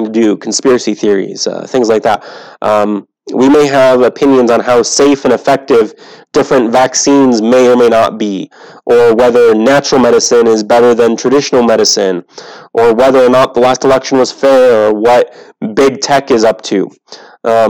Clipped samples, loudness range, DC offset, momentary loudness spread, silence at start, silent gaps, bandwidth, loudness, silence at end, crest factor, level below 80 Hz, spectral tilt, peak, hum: under 0.1%; 2 LU; under 0.1%; 10 LU; 0 s; none; 18 kHz; -9 LUFS; 0 s; 8 dB; -46 dBFS; -4 dB/octave; 0 dBFS; none